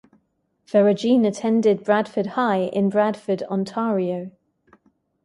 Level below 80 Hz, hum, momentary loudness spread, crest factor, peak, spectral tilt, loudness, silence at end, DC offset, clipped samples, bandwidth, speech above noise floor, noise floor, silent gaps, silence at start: -68 dBFS; none; 8 LU; 18 dB; -4 dBFS; -7 dB/octave; -21 LUFS; 0.95 s; under 0.1%; under 0.1%; 11 kHz; 49 dB; -70 dBFS; none; 0.75 s